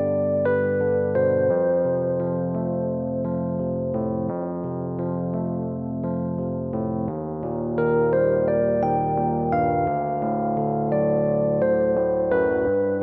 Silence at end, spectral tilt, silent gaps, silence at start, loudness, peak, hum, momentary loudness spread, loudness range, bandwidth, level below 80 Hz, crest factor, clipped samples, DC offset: 0 s; -10 dB/octave; none; 0 s; -23 LUFS; -10 dBFS; none; 7 LU; 5 LU; 3.7 kHz; -50 dBFS; 12 dB; under 0.1%; under 0.1%